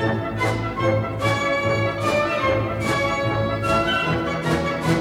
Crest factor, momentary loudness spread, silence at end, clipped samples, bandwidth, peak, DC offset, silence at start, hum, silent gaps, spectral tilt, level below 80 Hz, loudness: 14 dB; 3 LU; 0 s; under 0.1%; 16.5 kHz; -8 dBFS; under 0.1%; 0 s; none; none; -6 dB/octave; -42 dBFS; -21 LUFS